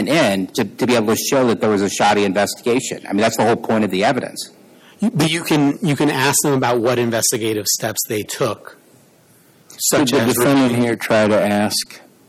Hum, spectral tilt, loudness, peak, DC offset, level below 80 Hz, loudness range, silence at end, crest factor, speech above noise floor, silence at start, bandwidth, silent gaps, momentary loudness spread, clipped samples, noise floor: none; -4 dB/octave; -17 LUFS; -4 dBFS; under 0.1%; -58 dBFS; 3 LU; 0.3 s; 12 dB; 34 dB; 0 s; 17 kHz; none; 7 LU; under 0.1%; -51 dBFS